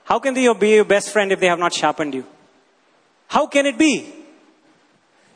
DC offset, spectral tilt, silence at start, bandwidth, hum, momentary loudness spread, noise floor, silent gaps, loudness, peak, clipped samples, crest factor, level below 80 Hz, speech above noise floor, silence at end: under 0.1%; -3.5 dB/octave; 0.05 s; 11 kHz; none; 10 LU; -58 dBFS; none; -17 LUFS; 0 dBFS; under 0.1%; 20 dB; -62 dBFS; 41 dB; 1.15 s